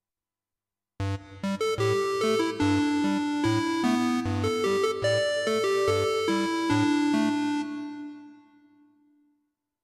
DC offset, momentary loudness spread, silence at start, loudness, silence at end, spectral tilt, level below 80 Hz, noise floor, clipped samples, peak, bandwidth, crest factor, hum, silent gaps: under 0.1%; 9 LU; 1 s; -26 LUFS; 1.5 s; -5.5 dB/octave; -60 dBFS; under -90 dBFS; under 0.1%; -14 dBFS; 14.5 kHz; 12 dB; none; none